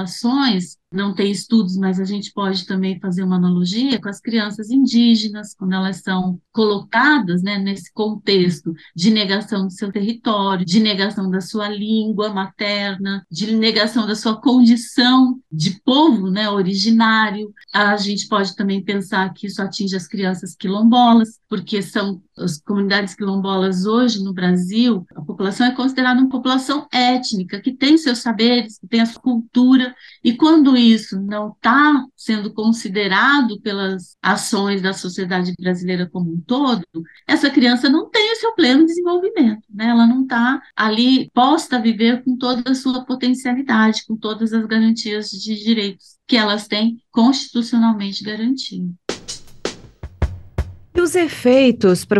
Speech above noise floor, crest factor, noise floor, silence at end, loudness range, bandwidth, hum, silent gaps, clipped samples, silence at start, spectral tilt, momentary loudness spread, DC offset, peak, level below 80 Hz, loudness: 20 dB; 14 dB; -37 dBFS; 0 s; 4 LU; 12.5 kHz; none; none; under 0.1%; 0 s; -5 dB/octave; 11 LU; under 0.1%; -2 dBFS; -44 dBFS; -17 LUFS